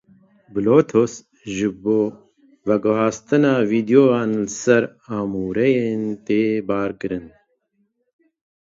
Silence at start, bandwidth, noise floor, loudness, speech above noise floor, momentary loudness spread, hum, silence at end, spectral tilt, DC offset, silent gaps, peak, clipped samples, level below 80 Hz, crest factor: 0.55 s; 7.8 kHz; -68 dBFS; -20 LUFS; 49 dB; 12 LU; none; 1.45 s; -6.5 dB/octave; under 0.1%; none; -2 dBFS; under 0.1%; -56 dBFS; 18 dB